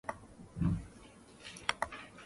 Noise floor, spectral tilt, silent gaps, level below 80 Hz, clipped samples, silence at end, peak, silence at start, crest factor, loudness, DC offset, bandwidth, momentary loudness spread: -57 dBFS; -5 dB/octave; none; -52 dBFS; under 0.1%; 0 s; -14 dBFS; 0.05 s; 28 dB; -38 LUFS; under 0.1%; 11.5 kHz; 19 LU